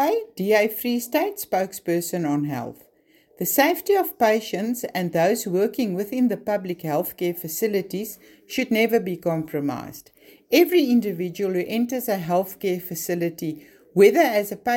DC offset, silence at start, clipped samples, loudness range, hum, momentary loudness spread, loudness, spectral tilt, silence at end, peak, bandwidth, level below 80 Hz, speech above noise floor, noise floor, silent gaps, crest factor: under 0.1%; 0 s; under 0.1%; 3 LU; none; 10 LU; -23 LUFS; -5 dB/octave; 0 s; -4 dBFS; 17 kHz; -66 dBFS; 36 dB; -58 dBFS; none; 20 dB